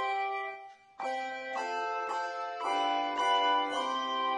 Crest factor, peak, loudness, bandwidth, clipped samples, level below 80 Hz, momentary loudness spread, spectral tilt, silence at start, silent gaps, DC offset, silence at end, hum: 14 dB; -18 dBFS; -32 LUFS; 10.5 kHz; under 0.1%; -80 dBFS; 10 LU; -1 dB/octave; 0 s; none; under 0.1%; 0 s; none